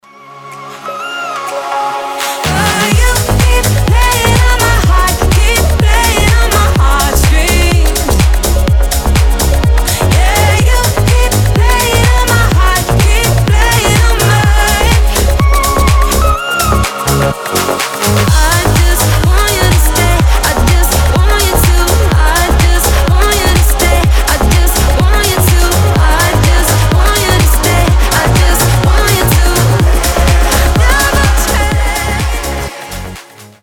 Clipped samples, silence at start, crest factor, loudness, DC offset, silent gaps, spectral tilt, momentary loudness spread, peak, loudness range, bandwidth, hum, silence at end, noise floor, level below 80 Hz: under 0.1%; 0.25 s; 8 dB; -10 LUFS; under 0.1%; none; -4 dB/octave; 5 LU; 0 dBFS; 2 LU; 18.5 kHz; none; 0.15 s; -32 dBFS; -12 dBFS